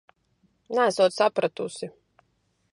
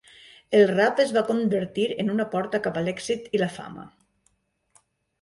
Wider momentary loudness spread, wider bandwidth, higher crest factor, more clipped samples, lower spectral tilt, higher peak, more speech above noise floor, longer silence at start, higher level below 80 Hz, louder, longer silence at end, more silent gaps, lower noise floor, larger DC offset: first, 15 LU vs 10 LU; about the same, 11.5 kHz vs 11.5 kHz; about the same, 20 dB vs 18 dB; neither; second, -4 dB/octave vs -5.5 dB/octave; about the same, -8 dBFS vs -8 dBFS; about the same, 47 dB vs 46 dB; first, 0.7 s vs 0.5 s; second, -76 dBFS vs -64 dBFS; about the same, -24 LUFS vs -24 LUFS; second, 0.85 s vs 1.35 s; neither; about the same, -71 dBFS vs -69 dBFS; neither